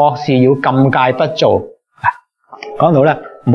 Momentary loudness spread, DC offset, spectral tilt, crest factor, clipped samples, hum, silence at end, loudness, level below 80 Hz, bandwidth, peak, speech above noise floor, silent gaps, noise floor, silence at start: 8 LU; under 0.1%; -7.5 dB/octave; 12 dB; under 0.1%; none; 0 s; -13 LUFS; -54 dBFS; 6.8 kHz; 0 dBFS; 27 dB; none; -38 dBFS; 0 s